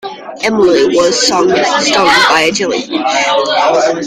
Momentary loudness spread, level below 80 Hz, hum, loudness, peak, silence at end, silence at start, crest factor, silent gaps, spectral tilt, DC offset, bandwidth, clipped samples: 8 LU; -48 dBFS; none; -10 LUFS; 0 dBFS; 0 s; 0.05 s; 10 dB; none; -2.5 dB/octave; under 0.1%; 15.5 kHz; under 0.1%